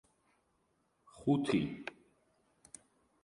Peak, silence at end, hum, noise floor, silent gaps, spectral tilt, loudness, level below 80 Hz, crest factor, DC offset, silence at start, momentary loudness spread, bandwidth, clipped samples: -18 dBFS; 1.35 s; none; -77 dBFS; none; -6.5 dB/octave; -35 LUFS; -68 dBFS; 22 dB; under 0.1%; 1.15 s; 24 LU; 11.5 kHz; under 0.1%